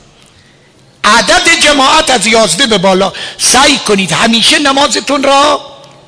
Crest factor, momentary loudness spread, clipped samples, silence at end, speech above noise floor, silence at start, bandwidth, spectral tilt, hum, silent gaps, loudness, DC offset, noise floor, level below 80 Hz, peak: 10 dB; 6 LU; 0.1%; 0.35 s; 35 dB; 1.05 s; 11 kHz; -2 dB/octave; none; none; -7 LUFS; under 0.1%; -43 dBFS; -38 dBFS; 0 dBFS